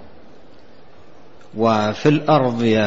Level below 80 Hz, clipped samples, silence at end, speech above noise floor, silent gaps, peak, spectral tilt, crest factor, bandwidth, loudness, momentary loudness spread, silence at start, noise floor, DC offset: -54 dBFS; under 0.1%; 0 s; 31 dB; none; -2 dBFS; -7 dB/octave; 16 dB; 7.8 kHz; -17 LUFS; 5 LU; 1.55 s; -47 dBFS; 1%